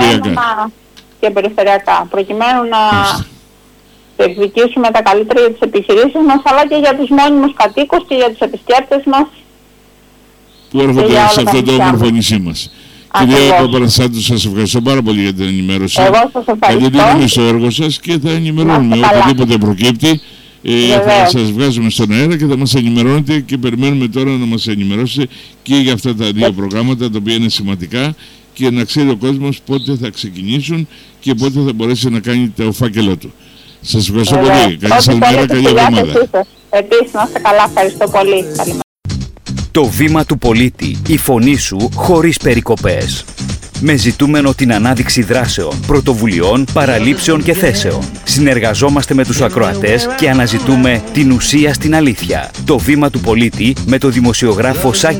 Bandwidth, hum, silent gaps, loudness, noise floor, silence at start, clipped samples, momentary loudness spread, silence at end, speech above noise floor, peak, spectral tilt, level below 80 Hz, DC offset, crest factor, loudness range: 19.5 kHz; none; 38.84-38.96 s; -11 LUFS; -44 dBFS; 0 s; under 0.1%; 9 LU; 0 s; 33 dB; 0 dBFS; -5 dB/octave; -32 dBFS; under 0.1%; 10 dB; 5 LU